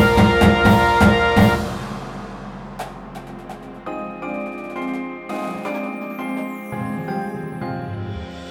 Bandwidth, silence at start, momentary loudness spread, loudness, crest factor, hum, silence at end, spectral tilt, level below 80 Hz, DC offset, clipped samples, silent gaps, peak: 17 kHz; 0 s; 20 LU; -20 LUFS; 16 dB; none; 0 s; -6.5 dB/octave; -36 dBFS; under 0.1%; under 0.1%; none; -4 dBFS